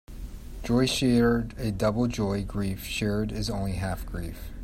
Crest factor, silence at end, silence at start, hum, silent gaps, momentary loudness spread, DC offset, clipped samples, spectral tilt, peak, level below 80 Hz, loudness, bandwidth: 16 dB; 0 s; 0.1 s; none; none; 16 LU; under 0.1%; under 0.1%; -5.5 dB/octave; -12 dBFS; -40 dBFS; -27 LUFS; 16 kHz